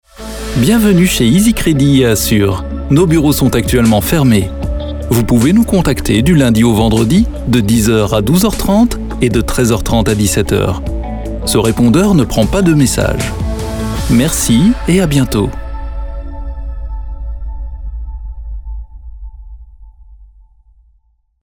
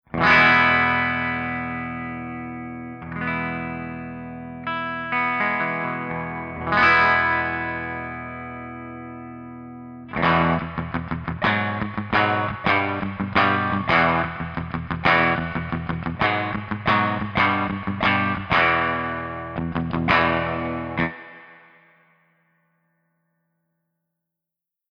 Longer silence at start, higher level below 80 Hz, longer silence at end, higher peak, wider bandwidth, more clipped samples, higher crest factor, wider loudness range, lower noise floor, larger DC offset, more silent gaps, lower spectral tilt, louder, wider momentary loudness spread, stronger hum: about the same, 0.2 s vs 0.1 s; first, -24 dBFS vs -48 dBFS; second, 1.2 s vs 3.35 s; first, 0 dBFS vs -6 dBFS; first, over 20 kHz vs 6.8 kHz; neither; second, 12 dB vs 18 dB; first, 16 LU vs 7 LU; second, -55 dBFS vs -84 dBFS; first, 0.2% vs under 0.1%; neither; second, -5.5 dB/octave vs -7 dB/octave; first, -12 LUFS vs -21 LUFS; about the same, 16 LU vs 17 LU; neither